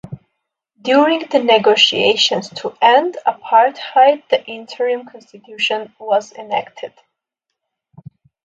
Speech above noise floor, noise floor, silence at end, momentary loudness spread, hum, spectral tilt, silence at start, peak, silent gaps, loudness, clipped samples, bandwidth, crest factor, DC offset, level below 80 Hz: 63 dB; -79 dBFS; 1.6 s; 15 LU; none; -3 dB/octave; 0.05 s; 0 dBFS; none; -15 LUFS; under 0.1%; 9.2 kHz; 16 dB; under 0.1%; -64 dBFS